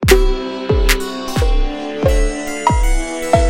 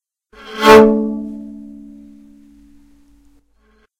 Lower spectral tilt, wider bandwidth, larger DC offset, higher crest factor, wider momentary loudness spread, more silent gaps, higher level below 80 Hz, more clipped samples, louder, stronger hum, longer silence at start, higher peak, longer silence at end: about the same, -5 dB/octave vs -5 dB/octave; about the same, 17 kHz vs 16 kHz; neither; about the same, 14 dB vs 16 dB; second, 7 LU vs 26 LU; neither; first, -18 dBFS vs -44 dBFS; second, under 0.1% vs 0.4%; second, -17 LUFS vs -11 LUFS; neither; second, 0 s vs 0.5 s; about the same, 0 dBFS vs 0 dBFS; second, 0 s vs 2.5 s